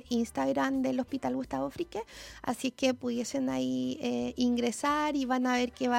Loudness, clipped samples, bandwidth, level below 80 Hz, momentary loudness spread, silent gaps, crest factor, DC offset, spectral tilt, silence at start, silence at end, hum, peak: -31 LUFS; under 0.1%; 16 kHz; -60 dBFS; 7 LU; none; 16 dB; under 0.1%; -4 dB/octave; 0.05 s; 0 s; none; -14 dBFS